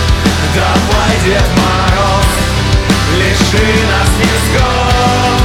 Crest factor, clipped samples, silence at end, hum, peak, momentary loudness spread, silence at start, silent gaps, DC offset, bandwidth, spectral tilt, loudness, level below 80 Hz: 10 dB; under 0.1%; 0 s; none; 0 dBFS; 2 LU; 0 s; none; under 0.1%; 17 kHz; -4.5 dB/octave; -10 LUFS; -16 dBFS